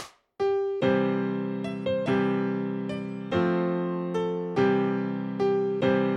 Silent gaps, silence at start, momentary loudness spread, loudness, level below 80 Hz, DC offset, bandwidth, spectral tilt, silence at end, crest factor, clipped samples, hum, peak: none; 0 s; 7 LU; -27 LUFS; -64 dBFS; under 0.1%; 8.2 kHz; -8 dB/octave; 0 s; 16 dB; under 0.1%; none; -10 dBFS